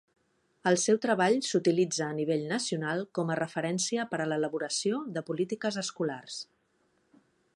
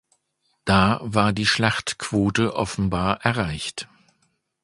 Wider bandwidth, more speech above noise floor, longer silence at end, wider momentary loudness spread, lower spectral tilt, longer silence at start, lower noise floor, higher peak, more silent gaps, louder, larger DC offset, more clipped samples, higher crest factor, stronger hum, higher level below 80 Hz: about the same, 11.5 kHz vs 11.5 kHz; second, 42 dB vs 49 dB; first, 1.15 s vs 0.8 s; second, 8 LU vs 11 LU; about the same, -4 dB/octave vs -5 dB/octave; about the same, 0.65 s vs 0.65 s; about the same, -72 dBFS vs -71 dBFS; second, -12 dBFS vs 0 dBFS; neither; second, -30 LUFS vs -22 LUFS; neither; neither; about the same, 18 dB vs 22 dB; neither; second, -78 dBFS vs -44 dBFS